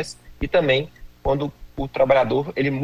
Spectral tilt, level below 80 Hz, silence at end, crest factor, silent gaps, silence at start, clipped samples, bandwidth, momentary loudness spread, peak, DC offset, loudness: -6 dB/octave; -40 dBFS; 0 s; 16 dB; none; 0 s; under 0.1%; 13 kHz; 14 LU; -6 dBFS; under 0.1%; -21 LUFS